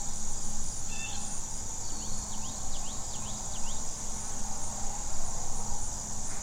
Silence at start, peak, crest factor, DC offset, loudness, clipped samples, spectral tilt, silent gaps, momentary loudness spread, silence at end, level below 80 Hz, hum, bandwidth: 0 s; -16 dBFS; 12 dB; under 0.1%; -36 LUFS; under 0.1%; -2 dB/octave; none; 1 LU; 0 s; -38 dBFS; none; 14 kHz